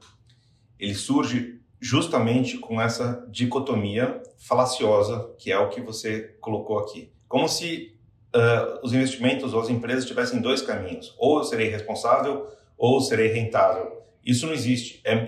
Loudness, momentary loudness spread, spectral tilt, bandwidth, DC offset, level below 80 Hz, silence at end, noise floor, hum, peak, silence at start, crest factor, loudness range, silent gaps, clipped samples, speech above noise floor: -24 LUFS; 10 LU; -5 dB/octave; 14 kHz; under 0.1%; -64 dBFS; 0 s; -59 dBFS; none; -8 dBFS; 0.8 s; 16 dB; 2 LU; none; under 0.1%; 35 dB